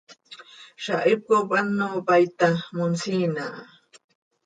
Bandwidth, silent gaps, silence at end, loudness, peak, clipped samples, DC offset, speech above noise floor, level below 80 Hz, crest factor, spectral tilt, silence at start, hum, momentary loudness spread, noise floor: 9.4 kHz; none; 0.8 s; -23 LUFS; -8 dBFS; under 0.1%; under 0.1%; 24 dB; -72 dBFS; 18 dB; -6 dB/octave; 0.1 s; none; 20 LU; -47 dBFS